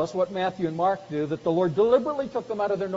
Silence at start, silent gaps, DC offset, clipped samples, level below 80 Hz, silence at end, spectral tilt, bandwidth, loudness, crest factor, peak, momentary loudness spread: 0 s; none; under 0.1%; under 0.1%; -62 dBFS; 0 s; -5.5 dB/octave; 7.6 kHz; -25 LUFS; 16 dB; -8 dBFS; 8 LU